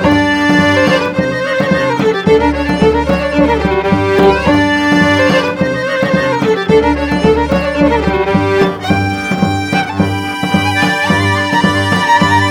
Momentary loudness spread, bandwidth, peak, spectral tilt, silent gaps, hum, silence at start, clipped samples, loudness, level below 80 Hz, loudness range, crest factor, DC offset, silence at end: 5 LU; 16 kHz; 0 dBFS; -6 dB/octave; none; none; 0 s; under 0.1%; -12 LUFS; -30 dBFS; 2 LU; 12 dB; under 0.1%; 0 s